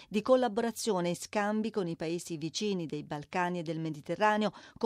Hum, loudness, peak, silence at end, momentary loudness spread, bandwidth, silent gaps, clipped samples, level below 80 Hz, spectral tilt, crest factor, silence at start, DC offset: none; -32 LUFS; -14 dBFS; 0 s; 9 LU; 15.5 kHz; none; under 0.1%; -72 dBFS; -5 dB/octave; 18 dB; 0 s; under 0.1%